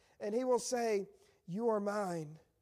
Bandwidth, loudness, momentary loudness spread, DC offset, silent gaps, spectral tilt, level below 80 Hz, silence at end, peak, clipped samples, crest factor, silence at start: 15 kHz; -36 LUFS; 12 LU; under 0.1%; none; -5 dB/octave; -80 dBFS; 0.25 s; -22 dBFS; under 0.1%; 16 dB; 0.2 s